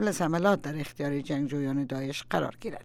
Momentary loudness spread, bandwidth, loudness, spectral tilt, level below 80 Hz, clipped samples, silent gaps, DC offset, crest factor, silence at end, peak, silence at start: 8 LU; 16.5 kHz; -30 LUFS; -6 dB/octave; -58 dBFS; under 0.1%; none; under 0.1%; 18 dB; 0 s; -10 dBFS; 0 s